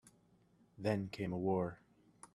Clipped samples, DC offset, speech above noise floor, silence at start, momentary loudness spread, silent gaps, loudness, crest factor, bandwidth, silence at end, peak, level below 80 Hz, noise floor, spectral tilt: under 0.1%; under 0.1%; 33 dB; 0.8 s; 6 LU; none; -39 LUFS; 20 dB; 12.5 kHz; 0.1 s; -22 dBFS; -74 dBFS; -71 dBFS; -7.5 dB/octave